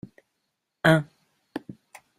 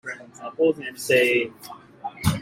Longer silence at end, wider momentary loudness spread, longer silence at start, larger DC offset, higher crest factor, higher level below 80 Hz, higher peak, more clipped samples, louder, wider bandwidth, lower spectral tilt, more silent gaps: first, 0.45 s vs 0 s; first, 23 LU vs 19 LU; first, 0.85 s vs 0.05 s; neither; first, 24 dB vs 18 dB; second, -64 dBFS vs -52 dBFS; about the same, -6 dBFS vs -6 dBFS; neither; about the same, -22 LUFS vs -22 LUFS; second, 13.5 kHz vs 16.5 kHz; first, -6.5 dB/octave vs -5 dB/octave; neither